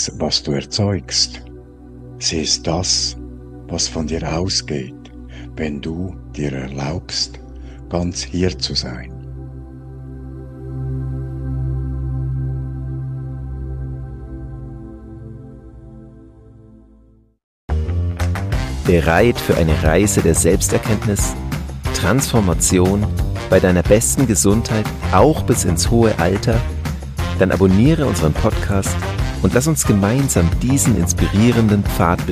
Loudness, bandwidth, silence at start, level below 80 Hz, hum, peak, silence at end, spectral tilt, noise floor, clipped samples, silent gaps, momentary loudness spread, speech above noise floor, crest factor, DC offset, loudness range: -17 LUFS; 15.5 kHz; 0 s; -28 dBFS; none; -2 dBFS; 0 s; -5 dB/octave; -50 dBFS; under 0.1%; 17.44-17.68 s; 19 LU; 34 dB; 16 dB; under 0.1%; 12 LU